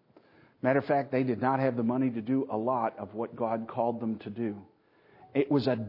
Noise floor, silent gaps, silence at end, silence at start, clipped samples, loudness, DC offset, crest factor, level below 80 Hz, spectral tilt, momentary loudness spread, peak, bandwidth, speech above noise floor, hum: -62 dBFS; none; 0 s; 0.65 s; under 0.1%; -30 LUFS; under 0.1%; 18 dB; -76 dBFS; -10 dB/octave; 8 LU; -12 dBFS; 5.8 kHz; 32 dB; none